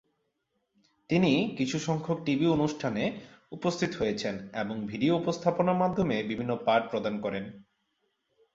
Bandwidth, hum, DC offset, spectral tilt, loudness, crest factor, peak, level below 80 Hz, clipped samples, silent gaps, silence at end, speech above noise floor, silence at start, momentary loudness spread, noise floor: 7.8 kHz; none; under 0.1%; -6 dB/octave; -29 LUFS; 20 dB; -10 dBFS; -62 dBFS; under 0.1%; none; 0.9 s; 50 dB; 1.1 s; 8 LU; -79 dBFS